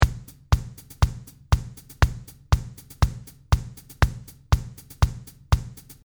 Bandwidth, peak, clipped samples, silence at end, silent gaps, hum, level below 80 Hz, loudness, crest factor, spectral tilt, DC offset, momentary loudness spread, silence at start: over 20 kHz; 0 dBFS; under 0.1%; 0.3 s; none; none; -28 dBFS; -26 LUFS; 24 dB; -5.5 dB/octave; under 0.1%; 16 LU; 0 s